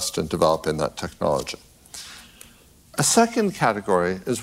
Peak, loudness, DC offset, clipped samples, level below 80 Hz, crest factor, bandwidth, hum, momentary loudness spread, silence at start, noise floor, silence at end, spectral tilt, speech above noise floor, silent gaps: -4 dBFS; -22 LUFS; under 0.1%; under 0.1%; -50 dBFS; 18 dB; 16 kHz; none; 20 LU; 0 s; -52 dBFS; 0 s; -4 dB/octave; 30 dB; none